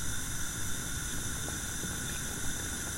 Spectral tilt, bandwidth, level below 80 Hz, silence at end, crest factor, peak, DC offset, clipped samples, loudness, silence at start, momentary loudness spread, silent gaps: -2.5 dB/octave; 16 kHz; -44 dBFS; 0 s; 14 dB; -20 dBFS; under 0.1%; under 0.1%; -35 LUFS; 0 s; 0 LU; none